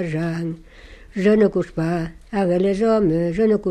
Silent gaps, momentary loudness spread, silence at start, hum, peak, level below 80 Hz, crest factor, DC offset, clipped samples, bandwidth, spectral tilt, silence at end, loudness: none; 11 LU; 0 s; none; -6 dBFS; -44 dBFS; 14 dB; under 0.1%; under 0.1%; 10 kHz; -8 dB/octave; 0 s; -20 LUFS